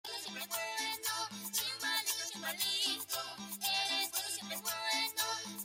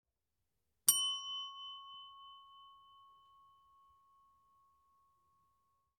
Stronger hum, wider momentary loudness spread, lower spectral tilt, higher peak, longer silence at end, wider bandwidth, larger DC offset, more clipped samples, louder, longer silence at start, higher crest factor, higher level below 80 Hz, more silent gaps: neither; second, 7 LU vs 26 LU; first, 0.5 dB/octave vs 3 dB/octave; second, -22 dBFS vs -12 dBFS; second, 0 s vs 3.25 s; first, 17 kHz vs 9 kHz; neither; neither; about the same, -35 LUFS vs -35 LUFS; second, 0.05 s vs 0.85 s; second, 18 dB vs 34 dB; first, -80 dBFS vs -90 dBFS; neither